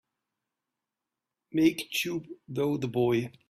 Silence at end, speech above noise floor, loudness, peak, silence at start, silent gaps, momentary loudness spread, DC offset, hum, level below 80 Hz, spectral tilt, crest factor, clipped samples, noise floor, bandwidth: 0.2 s; 60 dB; -29 LUFS; -10 dBFS; 1.55 s; none; 9 LU; under 0.1%; none; -66 dBFS; -5.5 dB/octave; 22 dB; under 0.1%; -88 dBFS; 15.5 kHz